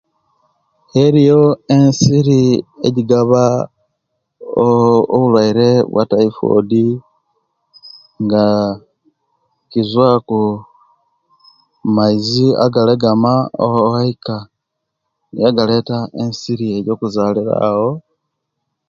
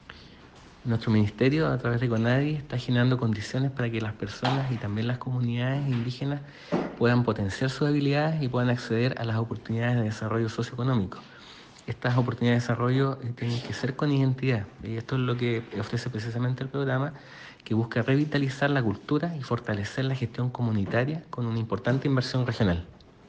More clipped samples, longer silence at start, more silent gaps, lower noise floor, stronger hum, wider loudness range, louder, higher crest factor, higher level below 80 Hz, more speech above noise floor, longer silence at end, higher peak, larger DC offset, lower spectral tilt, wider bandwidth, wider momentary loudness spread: neither; first, 0.95 s vs 0.1 s; neither; first, -75 dBFS vs -50 dBFS; neither; first, 6 LU vs 3 LU; first, -14 LUFS vs -28 LUFS; about the same, 14 dB vs 16 dB; about the same, -52 dBFS vs -56 dBFS; first, 63 dB vs 24 dB; first, 0.9 s vs 0.35 s; first, 0 dBFS vs -10 dBFS; neither; about the same, -7 dB/octave vs -7.5 dB/octave; second, 7.6 kHz vs 8.4 kHz; first, 11 LU vs 8 LU